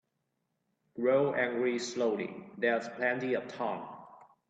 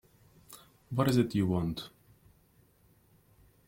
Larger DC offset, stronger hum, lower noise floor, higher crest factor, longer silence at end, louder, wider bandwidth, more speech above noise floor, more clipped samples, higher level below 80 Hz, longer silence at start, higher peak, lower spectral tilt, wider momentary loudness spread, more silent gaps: neither; neither; first, -81 dBFS vs -65 dBFS; about the same, 18 dB vs 20 dB; second, 0.25 s vs 1.8 s; about the same, -32 LUFS vs -31 LUFS; second, 8.8 kHz vs 16.5 kHz; first, 50 dB vs 36 dB; neither; second, -80 dBFS vs -60 dBFS; first, 0.95 s vs 0.5 s; about the same, -14 dBFS vs -14 dBFS; second, -5 dB/octave vs -7 dB/octave; second, 13 LU vs 25 LU; neither